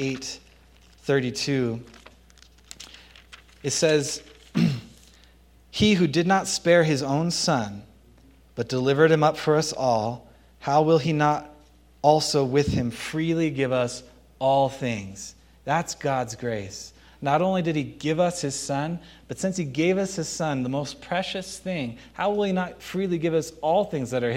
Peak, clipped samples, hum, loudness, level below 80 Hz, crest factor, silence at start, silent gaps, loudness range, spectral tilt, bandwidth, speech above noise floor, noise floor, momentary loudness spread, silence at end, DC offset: -4 dBFS; under 0.1%; none; -24 LUFS; -54 dBFS; 20 dB; 0 s; none; 5 LU; -5 dB/octave; 16.5 kHz; 31 dB; -54 dBFS; 15 LU; 0 s; under 0.1%